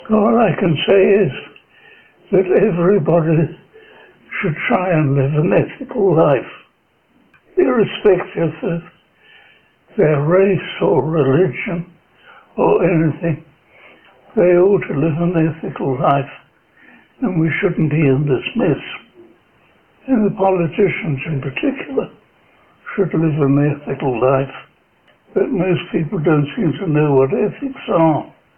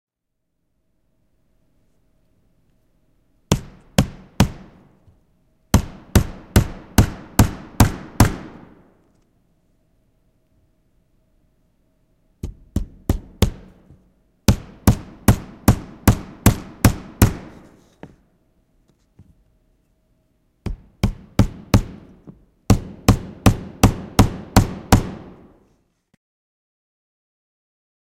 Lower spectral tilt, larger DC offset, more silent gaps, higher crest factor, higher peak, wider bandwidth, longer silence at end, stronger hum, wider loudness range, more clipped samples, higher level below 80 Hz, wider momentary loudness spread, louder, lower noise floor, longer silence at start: first, -11 dB/octave vs -5.5 dB/octave; neither; neither; second, 16 dB vs 22 dB; about the same, 0 dBFS vs 0 dBFS; second, 3.3 kHz vs 16 kHz; second, 0.3 s vs 2.95 s; neither; second, 3 LU vs 10 LU; neither; second, -48 dBFS vs -30 dBFS; second, 10 LU vs 15 LU; first, -16 LUFS vs -20 LUFS; second, -59 dBFS vs -77 dBFS; second, 0 s vs 3.5 s